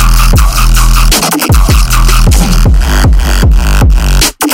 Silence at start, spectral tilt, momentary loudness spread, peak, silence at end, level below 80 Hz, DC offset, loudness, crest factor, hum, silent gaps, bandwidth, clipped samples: 0 s; -4 dB/octave; 1 LU; 0 dBFS; 0 s; -6 dBFS; under 0.1%; -8 LUFS; 6 dB; none; none; 17 kHz; 0.8%